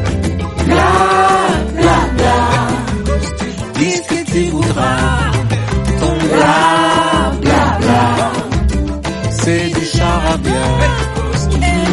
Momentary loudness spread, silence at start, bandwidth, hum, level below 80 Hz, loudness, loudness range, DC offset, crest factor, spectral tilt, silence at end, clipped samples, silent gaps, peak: 7 LU; 0 s; 11.5 kHz; none; -22 dBFS; -13 LUFS; 3 LU; under 0.1%; 12 dB; -5.5 dB/octave; 0 s; under 0.1%; none; 0 dBFS